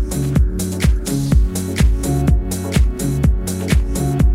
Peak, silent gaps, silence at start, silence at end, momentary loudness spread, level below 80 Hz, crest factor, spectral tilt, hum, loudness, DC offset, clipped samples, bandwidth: -2 dBFS; none; 0 s; 0 s; 3 LU; -18 dBFS; 12 dB; -6 dB/octave; none; -18 LUFS; under 0.1%; under 0.1%; 16 kHz